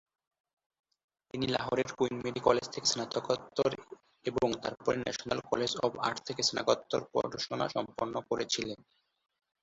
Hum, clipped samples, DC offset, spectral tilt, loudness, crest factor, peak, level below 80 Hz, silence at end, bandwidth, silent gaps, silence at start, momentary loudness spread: none; under 0.1%; under 0.1%; -3.5 dB/octave; -33 LUFS; 24 dB; -10 dBFS; -64 dBFS; 0.9 s; 8 kHz; none; 1.35 s; 7 LU